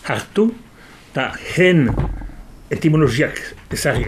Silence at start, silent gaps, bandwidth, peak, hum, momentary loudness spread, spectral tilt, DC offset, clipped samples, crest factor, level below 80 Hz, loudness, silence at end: 0.05 s; none; 15.5 kHz; -2 dBFS; none; 15 LU; -6 dB/octave; under 0.1%; under 0.1%; 16 dB; -34 dBFS; -18 LUFS; 0 s